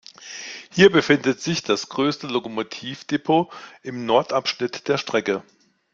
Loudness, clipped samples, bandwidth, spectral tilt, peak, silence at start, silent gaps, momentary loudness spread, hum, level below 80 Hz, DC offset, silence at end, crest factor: -22 LUFS; under 0.1%; 7.6 kHz; -4.5 dB/octave; -2 dBFS; 0.2 s; none; 17 LU; none; -64 dBFS; under 0.1%; 0.5 s; 22 dB